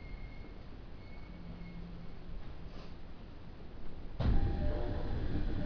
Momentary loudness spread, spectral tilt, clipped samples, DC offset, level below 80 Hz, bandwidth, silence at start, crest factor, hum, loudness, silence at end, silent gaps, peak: 17 LU; -9 dB/octave; under 0.1%; under 0.1%; -40 dBFS; 5.4 kHz; 0 s; 18 dB; none; -42 LUFS; 0 s; none; -18 dBFS